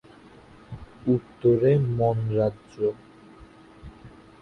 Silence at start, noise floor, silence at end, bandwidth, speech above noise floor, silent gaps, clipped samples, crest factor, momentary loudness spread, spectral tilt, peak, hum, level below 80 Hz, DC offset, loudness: 0.7 s; -50 dBFS; 0.35 s; 6.2 kHz; 27 dB; none; under 0.1%; 16 dB; 24 LU; -10.5 dB/octave; -10 dBFS; none; -52 dBFS; under 0.1%; -24 LUFS